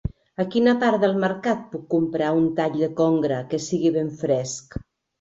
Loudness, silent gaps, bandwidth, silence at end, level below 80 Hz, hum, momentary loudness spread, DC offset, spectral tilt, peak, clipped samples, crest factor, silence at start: -22 LUFS; none; 8 kHz; 0.4 s; -46 dBFS; none; 10 LU; under 0.1%; -6 dB/octave; -6 dBFS; under 0.1%; 16 dB; 0.05 s